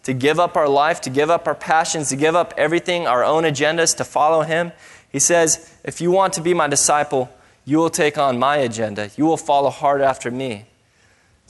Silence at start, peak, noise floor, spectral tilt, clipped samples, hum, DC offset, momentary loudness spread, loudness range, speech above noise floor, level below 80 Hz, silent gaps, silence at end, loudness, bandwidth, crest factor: 0.05 s; -2 dBFS; -57 dBFS; -3.5 dB/octave; under 0.1%; none; under 0.1%; 9 LU; 1 LU; 39 dB; -58 dBFS; none; 0.85 s; -18 LUFS; 12 kHz; 18 dB